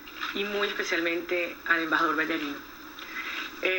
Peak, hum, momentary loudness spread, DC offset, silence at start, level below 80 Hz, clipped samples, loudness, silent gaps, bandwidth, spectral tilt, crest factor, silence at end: -10 dBFS; none; 12 LU; under 0.1%; 0 s; -64 dBFS; under 0.1%; -28 LUFS; none; 17.5 kHz; -3 dB/octave; 20 dB; 0 s